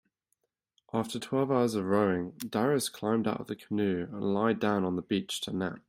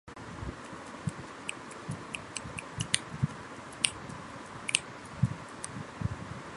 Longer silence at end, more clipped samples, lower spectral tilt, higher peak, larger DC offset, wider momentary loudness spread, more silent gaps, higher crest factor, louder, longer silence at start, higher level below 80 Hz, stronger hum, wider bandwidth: about the same, 0.1 s vs 0 s; neither; first, -5.5 dB/octave vs -3 dB/octave; second, -12 dBFS vs -2 dBFS; neither; second, 7 LU vs 13 LU; neither; second, 18 dB vs 34 dB; first, -30 LUFS vs -36 LUFS; first, 0.95 s vs 0.05 s; second, -70 dBFS vs -54 dBFS; neither; first, 16 kHz vs 11.5 kHz